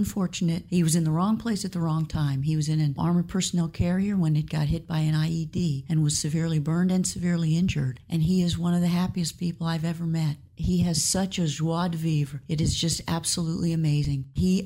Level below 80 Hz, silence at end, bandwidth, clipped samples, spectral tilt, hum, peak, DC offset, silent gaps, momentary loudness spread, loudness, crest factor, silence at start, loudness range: -44 dBFS; 0 s; 16 kHz; under 0.1%; -5.5 dB/octave; none; -12 dBFS; under 0.1%; none; 5 LU; -26 LUFS; 14 dB; 0 s; 1 LU